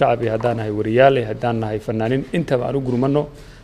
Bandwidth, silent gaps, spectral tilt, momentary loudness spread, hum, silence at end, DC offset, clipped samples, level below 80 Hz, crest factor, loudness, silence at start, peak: 12.5 kHz; none; -8 dB/octave; 8 LU; none; 0.05 s; under 0.1%; under 0.1%; -44 dBFS; 18 dB; -19 LUFS; 0 s; -2 dBFS